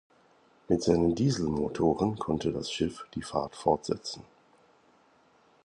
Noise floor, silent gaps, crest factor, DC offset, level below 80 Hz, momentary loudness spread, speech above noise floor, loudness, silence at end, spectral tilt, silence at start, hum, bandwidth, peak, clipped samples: -63 dBFS; none; 22 dB; under 0.1%; -52 dBFS; 9 LU; 35 dB; -29 LUFS; 1.45 s; -6 dB/octave; 0.7 s; none; 11 kHz; -10 dBFS; under 0.1%